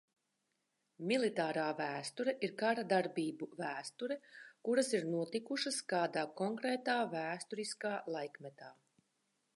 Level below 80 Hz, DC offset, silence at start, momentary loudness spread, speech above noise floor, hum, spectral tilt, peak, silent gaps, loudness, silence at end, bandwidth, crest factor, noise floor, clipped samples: under -90 dBFS; under 0.1%; 1 s; 11 LU; 46 dB; none; -4 dB/octave; -20 dBFS; none; -38 LUFS; 0.85 s; 11.5 kHz; 20 dB; -84 dBFS; under 0.1%